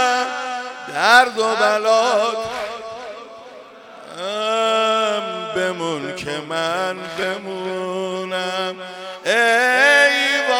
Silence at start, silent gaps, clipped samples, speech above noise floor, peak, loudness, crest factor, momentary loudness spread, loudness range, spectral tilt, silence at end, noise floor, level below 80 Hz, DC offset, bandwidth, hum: 0 s; none; under 0.1%; 21 dB; 0 dBFS; -18 LUFS; 20 dB; 17 LU; 6 LU; -2.5 dB/octave; 0 s; -40 dBFS; -66 dBFS; under 0.1%; 17 kHz; none